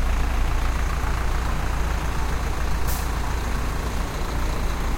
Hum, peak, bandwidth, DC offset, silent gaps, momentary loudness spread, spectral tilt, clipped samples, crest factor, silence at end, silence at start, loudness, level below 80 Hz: none; -10 dBFS; 16.5 kHz; under 0.1%; none; 2 LU; -5 dB/octave; under 0.1%; 12 dB; 0 s; 0 s; -27 LUFS; -24 dBFS